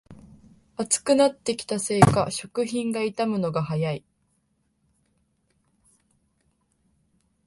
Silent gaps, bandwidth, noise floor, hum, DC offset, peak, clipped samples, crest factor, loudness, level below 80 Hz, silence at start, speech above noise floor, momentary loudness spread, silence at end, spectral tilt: none; 11.5 kHz; -71 dBFS; none; under 0.1%; 0 dBFS; under 0.1%; 26 dB; -24 LUFS; -56 dBFS; 0.1 s; 47 dB; 11 LU; 3.5 s; -5 dB/octave